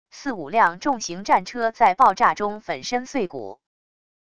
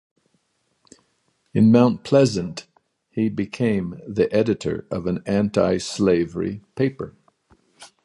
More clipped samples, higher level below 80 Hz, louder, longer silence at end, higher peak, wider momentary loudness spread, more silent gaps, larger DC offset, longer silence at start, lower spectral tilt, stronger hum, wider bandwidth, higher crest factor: neither; second, -58 dBFS vs -52 dBFS; about the same, -21 LUFS vs -21 LUFS; first, 0.75 s vs 0.2 s; about the same, -4 dBFS vs -2 dBFS; about the same, 14 LU vs 12 LU; neither; first, 0.5% vs under 0.1%; second, 0.15 s vs 1.55 s; second, -3.5 dB/octave vs -7 dB/octave; neither; about the same, 11 kHz vs 11.5 kHz; about the same, 18 dB vs 20 dB